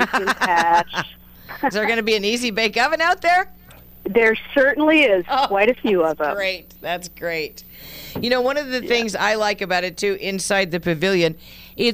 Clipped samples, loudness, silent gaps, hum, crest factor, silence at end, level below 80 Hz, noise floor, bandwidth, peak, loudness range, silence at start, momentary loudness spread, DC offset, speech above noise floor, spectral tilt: under 0.1%; -19 LUFS; none; none; 18 dB; 0 s; -50 dBFS; -43 dBFS; 15.5 kHz; -2 dBFS; 5 LU; 0 s; 13 LU; under 0.1%; 23 dB; -3.5 dB/octave